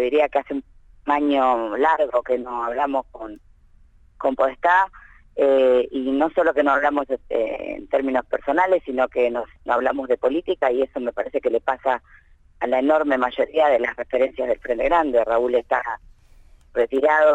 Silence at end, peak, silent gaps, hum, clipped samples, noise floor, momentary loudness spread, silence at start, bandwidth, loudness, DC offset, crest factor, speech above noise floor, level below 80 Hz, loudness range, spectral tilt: 0 s; -6 dBFS; none; none; under 0.1%; -52 dBFS; 9 LU; 0 s; 8 kHz; -21 LUFS; under 0.1%; 16 dB; 31 dB; -50 dBFS; 3 LU; -5.5 dB/octave